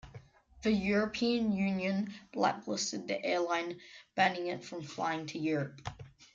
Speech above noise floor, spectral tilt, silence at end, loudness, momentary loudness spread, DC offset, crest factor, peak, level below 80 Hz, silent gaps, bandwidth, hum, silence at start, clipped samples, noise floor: 21 dB; -4.5 dB/octave; 0.1 s; -33 LUFS; 12 LU; under 0.1%; 20 dB; -14 dBFS; -64 dBFS; none; 7.8 kHz; none; 0.05 s; under 0.1%; -55 dBFS